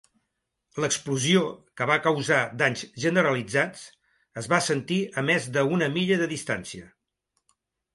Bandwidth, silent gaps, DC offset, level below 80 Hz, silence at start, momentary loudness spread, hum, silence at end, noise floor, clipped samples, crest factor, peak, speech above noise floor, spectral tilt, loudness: 11.5 kHz; none; under 0.1%; -66 dBFS; 0.75 s; 11 LU; none; 1.1 s; -80 dBFS; under 0.1%; 20 dB; -6 dBFS; 55 dB; -4 dB/octave; -25 LUFS